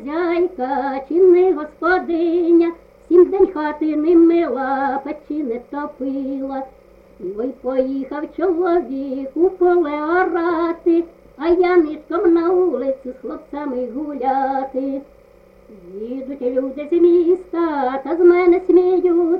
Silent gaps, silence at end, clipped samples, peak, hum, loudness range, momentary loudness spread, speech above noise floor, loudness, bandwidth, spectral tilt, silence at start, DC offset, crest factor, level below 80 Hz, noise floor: none; 0 s; under 0.1%; -2 dBFS; none; 8 LU; 14 LU; 31 dB; -18 LUFS; 4.9 kHz; -7.5 dB/octave; 0 s; under 0.1%; 16 dB; -52 dBFS; -48 dBFS